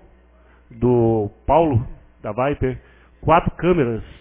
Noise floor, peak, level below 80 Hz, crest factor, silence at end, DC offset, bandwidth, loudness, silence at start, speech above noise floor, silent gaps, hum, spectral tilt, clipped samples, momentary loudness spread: -51 dBFS; -2 dBFS; -36 dBFS; 18 dB; 0.15 s; under 0.1%; 3.6 kHz; -20 LUFS; 0.7 s; 33 dB; none; none; -12 dB/octave; under 0.1%; 12 LU